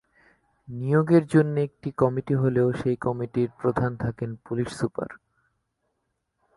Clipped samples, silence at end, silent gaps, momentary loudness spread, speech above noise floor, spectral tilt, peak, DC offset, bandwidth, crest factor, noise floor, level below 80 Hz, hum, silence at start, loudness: under 0.1%; 1.45 s; none; 12 LU; 53 dB; -8.5 dB/octave; -6 dBFS; under 0.1%; 11.5 kHz; 18 dB; -77 dBFS; -56 dBFS; none; 0.7 s; -25 LUFS